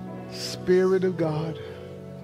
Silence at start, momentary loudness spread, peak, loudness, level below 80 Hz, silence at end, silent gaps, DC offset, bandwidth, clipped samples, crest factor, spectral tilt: 0 s; 18 LU; -10 dBFS; -25 LUFS; -60 dBFS; 0 s; none; under 0.1%; 14.5 kHz; under 0.1%; 16 dB; -6.5 dB/octave